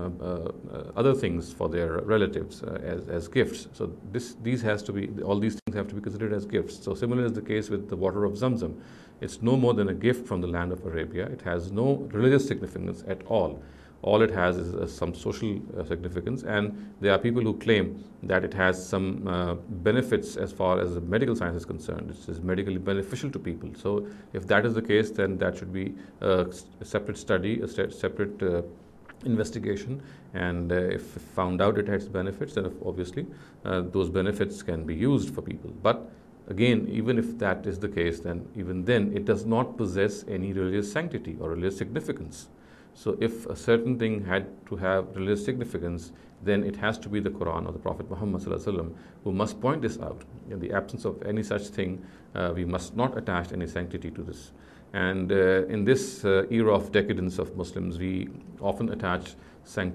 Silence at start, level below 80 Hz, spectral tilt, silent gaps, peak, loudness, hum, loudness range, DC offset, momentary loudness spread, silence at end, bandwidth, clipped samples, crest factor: 0 s; -46 dBFS; -6.5 dB/octave; 5.62-5.66 s; -6 dBFS; -28 LUFS; none; 4 LU; under 0.1%; 11 LU; 0 s; 13.5 kHz; under 0.1%; 22 dB